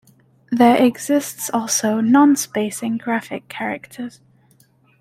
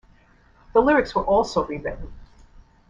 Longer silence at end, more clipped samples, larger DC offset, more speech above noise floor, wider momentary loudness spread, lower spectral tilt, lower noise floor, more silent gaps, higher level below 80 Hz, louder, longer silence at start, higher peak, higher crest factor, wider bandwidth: first, 0.9 s vs 0.65 s; neither; neither; first, 38 dB vs 34 dB; about the same, 16 LU vs 18 LU; second, -3.5 dB/octave vs -5.5 dB/octave; about the same, -56 dBFS vs -55 dBFS; neither; second, -64 dBFS vs -42 dBFS; first, -18 LUFS vs -21 LUFS; second, 0.5 s vs 0.75 s; about the same, -2 dBFS vs -4 dBFS; about the same, 16 dB vs 20 dB; first, 16 kHz vs 9.8 kHz